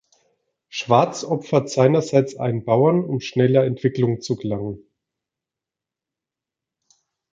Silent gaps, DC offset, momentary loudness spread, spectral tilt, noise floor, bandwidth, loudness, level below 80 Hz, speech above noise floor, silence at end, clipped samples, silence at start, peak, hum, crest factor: none; under 0.1%; 11 LU; -6.5 dB/octave; -88 dBFS; 7.8 kHz; -20 LUFS; -60 dBFS; 68 dB; 2.55 s; under 0.1%; 0.75 s; -2 dBFS; none; 20 dB